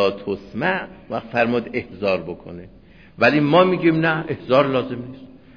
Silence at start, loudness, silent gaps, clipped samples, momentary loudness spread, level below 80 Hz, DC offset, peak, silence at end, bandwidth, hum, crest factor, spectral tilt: 0 s; -20 LUFS; none; under 0.1%; 17 LU; -54 dBFS; 0.2%; -2 dBFS; 0.2 s; 5.4 kHz; none; 18 dB; -8 dB/octave